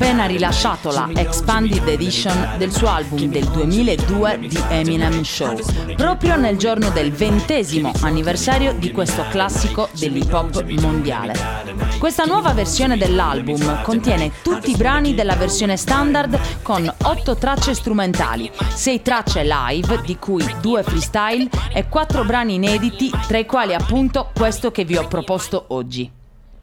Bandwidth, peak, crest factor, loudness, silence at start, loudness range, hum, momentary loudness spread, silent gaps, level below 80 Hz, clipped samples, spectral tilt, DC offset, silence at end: 17 kHz; -2 dBFS; 16 dB; -18 LUFS; 0 s; 2 LU; none; 5 LU; none; -26 dBFS; under 0.1%; -5 dB/octave; under 0.1%; 0 s